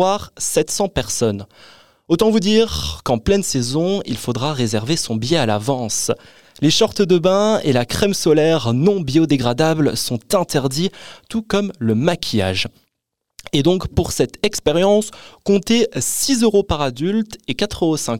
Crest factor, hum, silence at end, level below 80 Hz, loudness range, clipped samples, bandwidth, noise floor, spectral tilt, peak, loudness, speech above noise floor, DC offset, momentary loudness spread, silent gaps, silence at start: 16 dB; none; 0 s; -42 dBFS; 4 LU; under 0.1%; 17 kHz; -78 dBFS; -4.5 dB/octave; -2 dBFS; -18 LUFS; 60 dB; 1%; 7 LU; none; 0 s